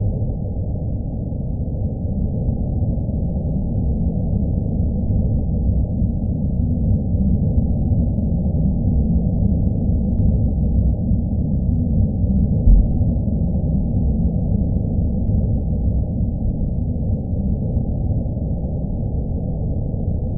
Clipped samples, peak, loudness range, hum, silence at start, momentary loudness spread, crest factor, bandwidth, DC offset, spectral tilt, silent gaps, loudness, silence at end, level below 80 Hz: under 0.1%; -2 dBFS; 4 LU; none; 0 s; 5 LU; 16 dB; 1 kHz; under 0.1%; -17 dB/octave; none; -21 LUFS; 0 s; -22 dBFS